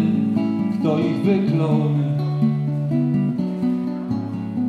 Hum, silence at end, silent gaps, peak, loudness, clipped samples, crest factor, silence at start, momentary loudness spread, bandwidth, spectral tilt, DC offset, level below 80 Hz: none; 0 s; none; -6 dBFS; -21 LUFS; under 0.1%; 14 dB; 0 s; 6 LU; 6 kHz; -9.5 dB/octave; under 0.1%; -60 dBFS